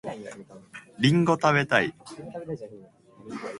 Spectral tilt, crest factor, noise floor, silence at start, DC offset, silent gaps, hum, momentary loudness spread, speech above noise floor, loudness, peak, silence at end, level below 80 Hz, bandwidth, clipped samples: -6 dB/octave; 22 dB; -50 dBFS; 0.05 s; under 0.1%; none; none; 24 LU; 24 dB; -23 LUFS; -4 dBFS; 0 s; -64 dBFS; 11.5 kHz; under 0.1%